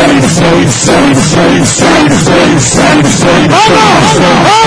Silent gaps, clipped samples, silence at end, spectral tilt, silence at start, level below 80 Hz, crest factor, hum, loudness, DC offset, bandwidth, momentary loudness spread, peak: none; 3%; 0 s; -4 dB/octave; 0 s; -28 dBFS; 6 dB; none; -5 LUFS; under 0.1%; 11 kHz; 2 LU; 0 dBFS